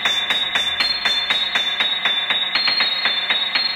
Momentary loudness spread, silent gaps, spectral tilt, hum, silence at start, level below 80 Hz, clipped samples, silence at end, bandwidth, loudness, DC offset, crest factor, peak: 2 LU; none; 0 dB/octave; none; 0 s; -56 dBFS; under 0.1%; 0 s; 16.5 kHz; -17 LUFS; under 0.1%; 16 dB; -4 dBFS